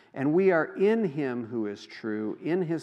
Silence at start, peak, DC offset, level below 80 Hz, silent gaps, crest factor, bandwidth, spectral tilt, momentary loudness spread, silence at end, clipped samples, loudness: 0.15 s; -12 dBFS; under 0.1%; -84 dBFS; none; 16 dB; 7.6 kHz; -8 dB/octave; 11 LU; 0 s; under 0.1%; -28 LUFS